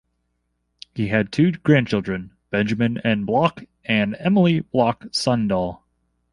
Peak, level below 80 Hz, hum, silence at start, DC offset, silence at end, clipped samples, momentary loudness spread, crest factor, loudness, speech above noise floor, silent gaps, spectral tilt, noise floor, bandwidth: -2 dBFS; -52 dBFS; 60 Hz at -45 dBFS; 0.95 s; under 0.1%; 0.55 s; under 0.1%; 10 LU; 20 dB; -21 LUFS; 52 dB; none; -6.5 dB/octave; -72 dBFS; 11.5 kHz